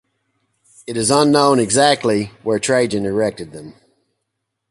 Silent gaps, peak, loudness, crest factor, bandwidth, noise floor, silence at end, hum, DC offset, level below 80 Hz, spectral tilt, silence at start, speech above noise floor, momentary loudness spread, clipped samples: none; 0 dBFS; -16 LUFS; 18 dB; 11.5 kHz; -76 dBFS; 1 s; none; under 0.1%; -54 dBFS; -4 dB/octave; 0.9 s; 60 dB; 20 LU; under 0.1%